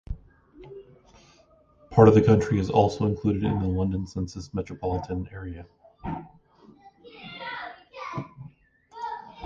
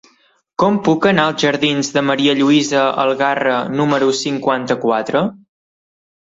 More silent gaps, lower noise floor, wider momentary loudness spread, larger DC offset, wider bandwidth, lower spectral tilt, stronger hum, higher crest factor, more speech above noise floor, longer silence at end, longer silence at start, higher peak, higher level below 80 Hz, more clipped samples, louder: neither; about the same, -59 dBFS vs -57 dBFS; first, 23 LU vs 5 LU; neither; about the same, 7.6 kHz vs 7.8 kHz; first, -8 dB/octave vs -4.5 dB/octave; neither; first, 24 dB vs 16 dB; second, 36 dB vs 42 dB; second, 0 s vs 0.95 s; second, 0.1 s vs 0.6 s; about the same, -2 dBFS vs -2 dBFS; first, -44 dBFS vs -58 dBFS; neither; second, -25 LUFS vs -15 LUFS